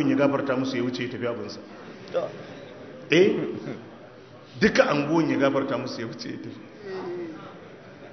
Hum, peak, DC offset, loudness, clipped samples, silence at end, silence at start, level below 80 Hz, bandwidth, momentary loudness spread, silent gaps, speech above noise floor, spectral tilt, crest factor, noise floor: none; -4 dBFS; under 0.1%; -25 LUFS; under 0.1%; 0 s; 0 s; -62 dBFS; 6.4 kHz; 22 LU; none; 22 dB; -6 dB/octave; 22 dB; -46 dBFS